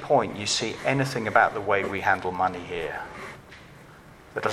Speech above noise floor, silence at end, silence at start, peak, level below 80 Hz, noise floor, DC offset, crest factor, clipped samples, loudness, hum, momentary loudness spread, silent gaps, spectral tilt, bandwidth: 24 dB; 0 s; 0 s; -4 dBFS; -56 dBFS; -49 dBFS; under 0.1%; 22 dB; under 0.1%; -25 LUFS; none; 17 LU; none; -4 dB/octave; 14.5 kHz